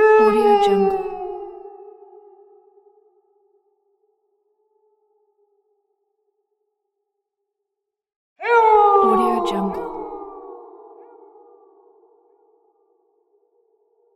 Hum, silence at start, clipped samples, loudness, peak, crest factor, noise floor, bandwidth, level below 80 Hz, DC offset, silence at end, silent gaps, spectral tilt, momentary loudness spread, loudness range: none; 0 s; under 0.1%; -17 LUFS; -4 dBFS; 18 dB; -83 dBFS; 12 kHz; -56 dBFS; under 0.1%; 3.55 s; 8.16-8.36 s; -6 dB/octave; 25 LU; 19 LU